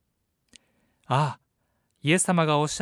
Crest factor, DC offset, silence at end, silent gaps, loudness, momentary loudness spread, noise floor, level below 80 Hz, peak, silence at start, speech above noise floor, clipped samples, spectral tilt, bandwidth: 20 dB; under 0.1%; 0 s; none; -24 LUFS; 9 LU; -75 dBFS; -66 dBFS; -8 dBFS; 1.1 s; 52 dB; under 0.1%; -4.5 dB/octave; 13.5 kHz